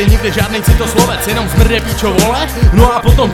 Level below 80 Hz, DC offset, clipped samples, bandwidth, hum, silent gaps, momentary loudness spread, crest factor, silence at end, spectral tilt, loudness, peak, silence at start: -14 dBFS; under 0.1%; 0.9%; 18 kHz; none; none; 4 LU; 10 dB; 0 s; -5 dB/octave; -11 LUFS; 0 dBFS; 0 s